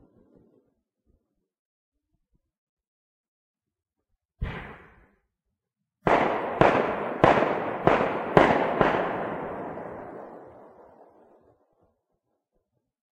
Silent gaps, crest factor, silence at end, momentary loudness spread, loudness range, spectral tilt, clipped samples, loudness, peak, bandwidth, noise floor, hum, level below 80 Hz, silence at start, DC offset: none; 28 dB; 2.5 s; 19 LU; 22 LU; -7 dB/octave; under 0.1%; -24 LUFS; 0 dBFS; 10.5 kHz; -84 dBFS; none; -50 dBFS; 4.4 s; under 0.1%